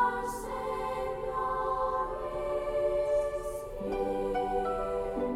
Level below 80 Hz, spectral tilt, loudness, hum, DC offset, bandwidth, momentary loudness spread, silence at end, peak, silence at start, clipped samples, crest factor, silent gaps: -48 dBFS; -5.5 dB/octave; -32 LUFS; none; under 0.1%; 16 kHz; 6 LU; 0 s; -18 dBFS; 0 s; under 0.1%; 14 dB; none